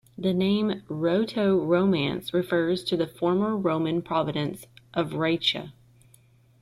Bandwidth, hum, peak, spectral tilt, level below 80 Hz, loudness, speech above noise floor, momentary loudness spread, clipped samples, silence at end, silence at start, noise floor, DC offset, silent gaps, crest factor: 14 kHz; none; -10 dBFS; -6.5 dB/octave; -62 dBFS; -26 LUFS; 33 dB; 8 LU; under 0.1%; 0.9 s; 0.2 s; -58 dBFS; under 0.1%; none; 16 dB